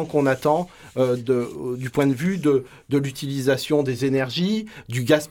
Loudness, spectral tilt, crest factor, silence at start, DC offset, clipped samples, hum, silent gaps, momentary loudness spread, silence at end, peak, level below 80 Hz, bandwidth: -23 LUFS; -6 dB/octave; 18 dB; 0 s; under 0.1%; under 0.1%; none; none; 7 LU; 0.05 s; -4 dBFS; -56 dBFS; 17.5 kHz